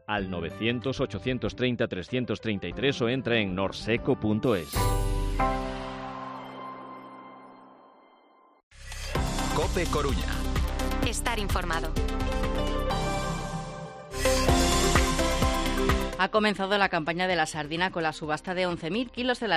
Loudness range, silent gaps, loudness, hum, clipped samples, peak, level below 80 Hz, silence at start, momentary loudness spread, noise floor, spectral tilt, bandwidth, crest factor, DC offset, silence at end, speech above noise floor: 9 LU; 8.63-8.71 s; -28 LUFS; none; under 0.1%; -8 dBFS; -34 dBFS; 0.1 s; 13 LU; -59 dBFS; -4.5 dB/octave; 15.5 kHz; 20 dB; under 0.1%; 0 s; 32 dB